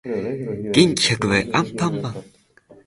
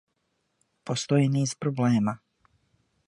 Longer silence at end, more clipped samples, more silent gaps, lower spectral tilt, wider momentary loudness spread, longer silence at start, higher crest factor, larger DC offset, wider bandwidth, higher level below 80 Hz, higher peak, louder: second, 0.65 s vs 0.9 s; neither; neither; second, -4.5 dB/octave vs -6 dB/octave; about the same, 12 LU vs 13 LU; second, 0.05 s vs 0.85 s; about the same, 20 dB vs 18 dB; neither; about the same, 11.5 kHz vs 11 kHz; first, -50 dBFS vs -66 dBFS; first, -2 dBFS vs -10 dBFS; first, -20 LUFS vs -26 LUFS